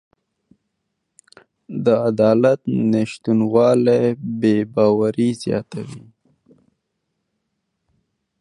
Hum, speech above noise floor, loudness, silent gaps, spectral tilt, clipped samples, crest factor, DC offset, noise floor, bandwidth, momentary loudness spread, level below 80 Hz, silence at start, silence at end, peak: none; 58 dB; -18 LUFS; none; -7.5 dB/octave; under 0.1%; 18 dB; under 0.1%; -75 dBFS; 11.5 kHz; 10 LU; -60 dBFS; 1.7 s; 2.45 s; -2 dBFS